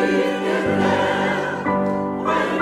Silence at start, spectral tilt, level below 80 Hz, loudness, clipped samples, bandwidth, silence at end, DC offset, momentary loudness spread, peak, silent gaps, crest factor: 0 s; -6 dB/octave; -52 dBFS; -20 LUFS; under 0.1%; 13 kHz; 0 s; under 0.1%; 4 LU; -8 dBFS; none; 12 dB